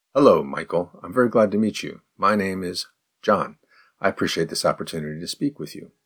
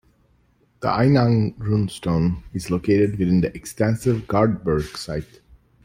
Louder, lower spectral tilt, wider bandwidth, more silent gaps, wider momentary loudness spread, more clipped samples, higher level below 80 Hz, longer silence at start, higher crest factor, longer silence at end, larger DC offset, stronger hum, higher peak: about the same, -23 LUFS vs -21 LUFS; second, -5 dB/octave vs -7.5 dB/octave; first, 19 kHz vs 16 kHz; neither; about the same, 13 LU vs 11 LU; neither; second, -62 dBFS vs -44 dBFS; second, 0.15 s vs 0.8 s; about the same, 20 dB vs 16 dB; second, 0.2 s vs 0.6 s; neither; neither; about the same, -2 dBFS vs -4 dBFS